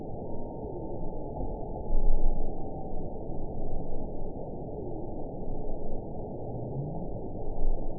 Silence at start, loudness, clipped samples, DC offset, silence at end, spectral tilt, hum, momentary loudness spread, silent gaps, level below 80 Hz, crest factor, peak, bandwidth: 0 s; -38 LUFS; under 0.1%; 0.5%; 0 s; -16 dB/octave; none; 5 LU; none; -30 dBFS; 16 dB; -10 dBFS; 1 kHz